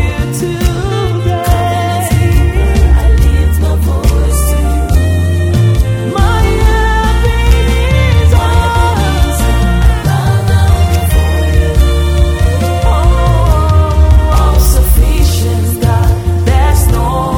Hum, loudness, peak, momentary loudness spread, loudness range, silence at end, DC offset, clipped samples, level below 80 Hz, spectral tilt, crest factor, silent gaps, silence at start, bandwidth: none; -11 LUFS; 0 dBFS; 4 LU; 1 LU; 0 s; under 0.1%; 0.3%; -10 dBFS; -6 dB/octave; 8 dB; none; 0 s; 19 kHz